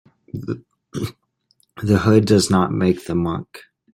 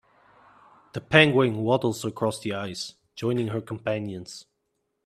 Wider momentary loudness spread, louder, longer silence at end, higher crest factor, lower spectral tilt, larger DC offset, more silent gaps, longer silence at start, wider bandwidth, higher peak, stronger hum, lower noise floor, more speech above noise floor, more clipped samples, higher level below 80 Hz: second, 17 LU vs 20 LU; first, -19 LUFS vs -25 LUFS; second, 0.35 s vs 0.65 s; second, 18 dB vs 26 dB; about the same, -6 dB/octave vs -5.5 dB/octave; neither; neither; second, 0.35 s vs 0.95 s; first, 16 kHz vs 14.5 kHz; about the same, -2 dBFS vs -2 dBFS; neither; second, -64 dBFS vs -77 dBFS; second, 47 dB vs 52 dB; neither; first, -50 dBFS vs -62 dBFS